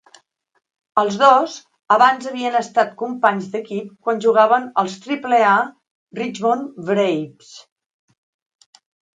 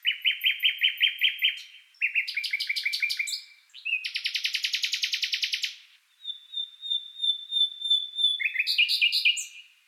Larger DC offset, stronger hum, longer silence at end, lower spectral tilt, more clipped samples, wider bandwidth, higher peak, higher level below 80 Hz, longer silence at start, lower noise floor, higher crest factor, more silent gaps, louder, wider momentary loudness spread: neither; neither; first, 1.55 s vs 0.25 s; first, -4.5 dB/octave vs 13 dB/octave; neither; second, 9.2 kHz vs 16.5 kHz; first, 0 dBFS vs -8 dBFS; first, -74 dBFS vs under -90 dBFS; first, 0.95 s vs 0.05 s; about the same, -53 dBFS vs -55 dBFS; about the same, 20 dB vs 20 dB; first, 5.91-6.07 s vs none; first, -18 LUFS vs -25 LUFS; about the same, 13 LU vs 11 LU